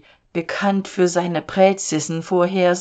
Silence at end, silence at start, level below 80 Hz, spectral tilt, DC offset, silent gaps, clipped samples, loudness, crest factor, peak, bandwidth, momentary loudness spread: 0 s; 0.35 s; -60 dBFS; -5 dB/octave; under 0.1%; none; under 0.1%; -19 LUFS; 18 dB; -2 dBFS; 9.2 kHz; 8 LU